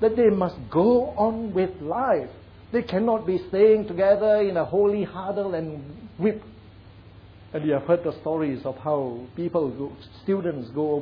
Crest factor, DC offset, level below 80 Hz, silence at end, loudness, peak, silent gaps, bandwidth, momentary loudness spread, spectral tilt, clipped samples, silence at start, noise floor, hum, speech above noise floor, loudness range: 16 dB; under 0.1%; -54 dBFS; 0 s; -24 LUFS; -8 dBFS; none; 5.2 kHz; 12 LU; -10 dB/octave; under 0.1%; 0 s; -47 dBFS; none; 24 dB; 6 LU